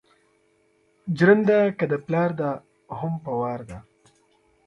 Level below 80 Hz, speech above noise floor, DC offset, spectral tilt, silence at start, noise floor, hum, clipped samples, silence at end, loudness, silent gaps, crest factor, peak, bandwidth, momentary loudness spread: -60 dBFS; 42 dB; under 0.1%; -8.5 dB/octave; 1.05 s; -64 dBFS; none; under 0.1%; 0.85 s; -23 LUFS; none; 20 dB; -4 dBFS; 9.2 kHz; 21 LU